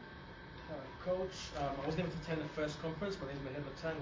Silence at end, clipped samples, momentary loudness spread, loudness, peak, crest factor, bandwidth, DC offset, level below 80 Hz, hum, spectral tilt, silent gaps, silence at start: 0 s; under 0.1%; 10 LU; -41 LUFS; -24 dBFS; 16 dB; 7.6 kHz; under 0.1%; -58 dBFS; none; -6 dB/octave; none; 0 s